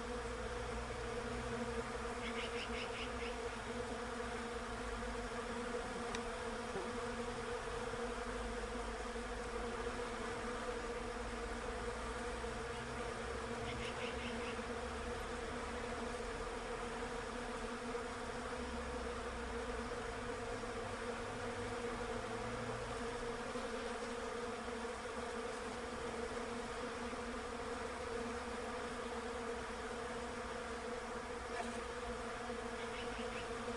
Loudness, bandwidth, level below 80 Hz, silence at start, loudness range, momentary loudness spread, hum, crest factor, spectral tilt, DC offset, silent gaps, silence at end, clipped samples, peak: -44 LUFS; 11.5 kHz; -54 dBFS; 0 s; 1 LU; 2 LU; none; 16 dB; -4 dB/octave; under 0.1%; none; 0 s; under 0.1%; -28 dBFS